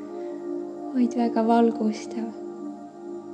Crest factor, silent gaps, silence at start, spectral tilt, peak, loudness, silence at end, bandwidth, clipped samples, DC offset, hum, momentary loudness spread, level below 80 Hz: 18 dB; none; 0 s; -6.5 dB/octave; -8 dBFS; -26 LUFS; 0 s; 8.8 kHz; under 0.1%; under 0.1%; none; 17 LU; -82 dBFS